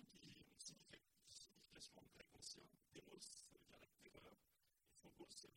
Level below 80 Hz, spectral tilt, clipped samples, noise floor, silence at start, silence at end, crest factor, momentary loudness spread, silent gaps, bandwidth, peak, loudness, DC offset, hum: -86 dBFS; -2 dB/octave; under 0.1%; -85 dBFS; 0 s; 0 s; 22 dB; 10 LU; none; 16.5 kHz; -44 dBFS; -63 LUFS; under 0.1%; none